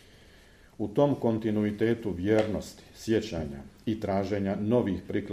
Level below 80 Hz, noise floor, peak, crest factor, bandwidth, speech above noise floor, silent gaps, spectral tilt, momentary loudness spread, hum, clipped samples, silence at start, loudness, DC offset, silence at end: -54 dBFS; -55 dBFS; -12 dBFS; 18 dB; 15 kHz; 27 dB; none; -7.5 dB/octave; 11 LU; none; under 0.1%; 0.8 s; -29 LUFS; under 0.1%; 0 s